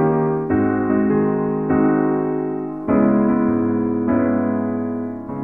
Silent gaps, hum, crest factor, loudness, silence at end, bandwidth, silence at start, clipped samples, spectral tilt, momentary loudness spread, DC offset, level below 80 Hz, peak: none; none; 14 dB; -19 LUFS; 0 s; 2.8 kHz; 0 s; under 0.1%; -12.5 dB/octave; 7 LU; 0.3%; -48 dBFS; -4 dBFS